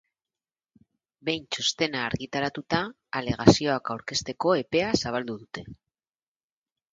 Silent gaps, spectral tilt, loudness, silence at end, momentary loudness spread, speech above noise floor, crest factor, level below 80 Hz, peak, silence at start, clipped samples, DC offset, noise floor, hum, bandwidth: none; -4.5 dB/octave; -26 LUFS; 1.2 s; 13 LU; over 64 dB; 28 dB; -52 dBFS; 0 dBFS; 1.25 s; under 0.1%; under 0.1%; under -90 dBFS; none; 9.4 kHz